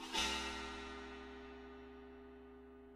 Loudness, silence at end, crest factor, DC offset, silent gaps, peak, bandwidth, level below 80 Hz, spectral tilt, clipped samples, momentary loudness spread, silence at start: -44 LUFS; 0 s; 22 dB; under 0.1%; none; -26 dBFS; 16 kHz; -60 dBFS; -2 dB/octave; under 0.1%; 20 LU; 0 s